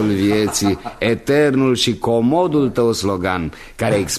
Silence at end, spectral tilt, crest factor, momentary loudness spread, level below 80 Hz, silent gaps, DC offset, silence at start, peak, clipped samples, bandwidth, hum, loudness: 0 s; -5 dB/octave; 14 dB; 6 LU; -42 dBFS; none; under 0.1%; 0 s; -2 dBFS; under 0.1%; 13.5 kHz; none; -17 LUFS